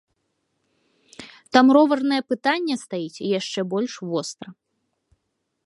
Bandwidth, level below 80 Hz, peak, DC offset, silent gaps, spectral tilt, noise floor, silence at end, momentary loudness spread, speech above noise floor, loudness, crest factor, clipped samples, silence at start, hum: 11.5 kHz; -72 dBFS; -2 dBFS; under 0.1%; none; -4.5 dB/octave; -76 dBFS; 1.15 s; 25 LU; 55 dB; -21 LUFS; 22 dB; under 0.1%; 1.2 s; none